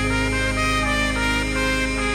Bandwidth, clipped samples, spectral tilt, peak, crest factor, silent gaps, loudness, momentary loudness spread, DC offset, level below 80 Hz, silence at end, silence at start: 16 kHz; under 0.1%; -4 dB/octave; -8 dBFS; 14 dB; none; -21 LUFS; 1 LU; under 0.1%; -28 dBFS; 0 s; 0 s